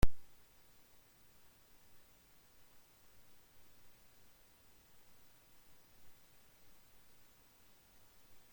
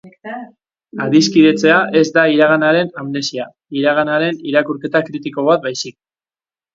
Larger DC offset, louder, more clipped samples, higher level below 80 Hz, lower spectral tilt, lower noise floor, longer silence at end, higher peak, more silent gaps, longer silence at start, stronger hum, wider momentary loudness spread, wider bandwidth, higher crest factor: neither; second, -59 LUFS vs -14 LUFS; neither; first, -50 dBFS vs -62 dBFS; about the same, -5.5 dB/octave vs -5 dB/octave; second, -65 dBFS vs under -90 dBFS; first, 8.3 s vs 0.85 s; second, -14 dBFS vs 0 dBFS; neither; about the same, 0.05 s vs 0.05 s; neither; second, 1 LU vs 16 LU; first, 16.5 kHz vs 7.6 kHz; first, 26 dB vs 16 dB